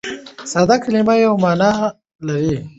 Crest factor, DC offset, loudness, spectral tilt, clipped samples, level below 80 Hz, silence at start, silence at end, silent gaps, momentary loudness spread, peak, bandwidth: 16 dB; under 0.1%; -16 LUFS; -6 dB/octave; under 0.1%; -48 dBFS; 0.05 s; 0.1 s; 2.15-2.19 s; 14 LU; -2 dBFS; 8.2 kHz